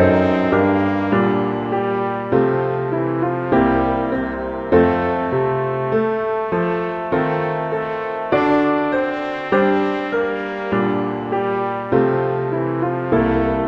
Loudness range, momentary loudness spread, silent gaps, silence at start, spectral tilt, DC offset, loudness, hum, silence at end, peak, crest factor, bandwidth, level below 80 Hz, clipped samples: 2 LU; 6 LU; none; 0 s; -9 dB/octave; under 0.1%; -19 LUFS; none; 0 s; -2 dBFS; 16 dB; 6.8 kHz; -42 dBFS; under 0.1%